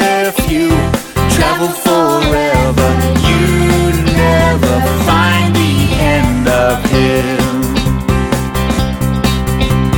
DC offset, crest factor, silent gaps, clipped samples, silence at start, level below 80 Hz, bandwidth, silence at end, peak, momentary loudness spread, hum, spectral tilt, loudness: under 0.1%; 12 dB; none; under 0.1%; 0 s; -20 dBFS; 19 kHz; 0 s; 0 dBFS; 4 LU; none; -5.5 dB/octave; -12 LUFS